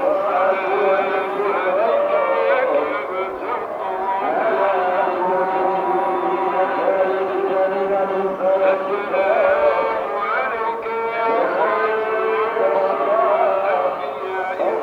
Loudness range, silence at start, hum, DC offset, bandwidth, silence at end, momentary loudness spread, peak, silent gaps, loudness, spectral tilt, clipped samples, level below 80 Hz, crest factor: 1 LU; 0 s; none; under 0.1%; 5.8 kHz; 0 s; 6 LU; -2 dBFS; none; -19 LUFS; -6 dB/octave; under 0.1%; -62 dBFS; 16 dB